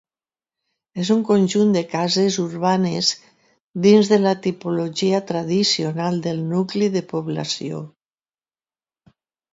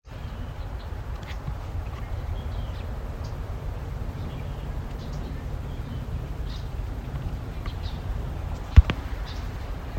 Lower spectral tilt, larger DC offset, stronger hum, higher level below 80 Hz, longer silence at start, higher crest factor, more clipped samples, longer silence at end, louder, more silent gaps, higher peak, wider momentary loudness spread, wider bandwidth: second, -5 dB/octave vs -7 dB/octave; neither; neither; second, -66 dBFS vs -30 dBFS; first, 0.95 s vs 0.05 s; second, 18 dB vs 28 dB; neither; first, 1.65 s vs 0 s; first, -20 LUFS vs -31 LUFS; first, 3.60-3.74 s vs none; about the same, -2 dBFS vs 0 dBFS; first, 11 LU vs 4 LU; second, 7.8 kHz vs 15.5 kHz